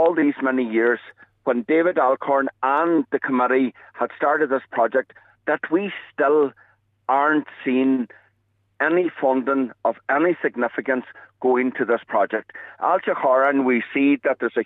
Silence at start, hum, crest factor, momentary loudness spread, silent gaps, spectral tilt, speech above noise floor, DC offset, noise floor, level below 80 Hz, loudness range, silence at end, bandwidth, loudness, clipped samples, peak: 0 s; none; 14 dB; 7 LU; none; -8 dB/octave; 47 dB; under 0.1%; -67 dBFS; -76 dBFS; 2 LU; 0 s; 4 kHz; -21 LUFS; under 0.1%; -6 dBFS